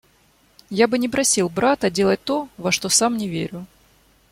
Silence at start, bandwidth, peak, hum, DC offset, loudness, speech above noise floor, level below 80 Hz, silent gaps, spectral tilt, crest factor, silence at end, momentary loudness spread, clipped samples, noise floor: 0.7 s; 16.5 kHz; -4 dBFS; none; under 0.1%; -20 LUFS; 38 dB; -56 dBFS; none; -3 dB/octave; 18 dB; 0.65 s; 11 LU; under 0.1%; -58 dBFS